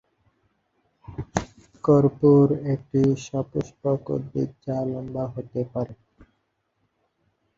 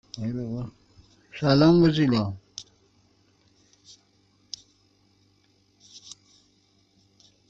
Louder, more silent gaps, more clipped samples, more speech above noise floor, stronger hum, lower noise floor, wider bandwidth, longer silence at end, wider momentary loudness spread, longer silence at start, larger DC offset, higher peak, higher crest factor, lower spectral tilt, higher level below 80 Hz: about the same, -24 LUFS vs -23 LUFS; neither; neither; first, 50 dB vs 43 dB; neither; first, -73 dBFS vs -64 dBFS; about the same, 7.6 kHz vs 7.8 kHz; first, 1.65 s vs 1.35 s; second, 13 LU vs 27 LU; first, 1.1 s vs 0.15 s; neither; first, -2 dBFS vs -8 dBFS; about the same, 22 dB vs 20 dB; first, -8.5 dB/octave vs -7 dB/octave; about the same, -52 dBFS vs -56 dBFS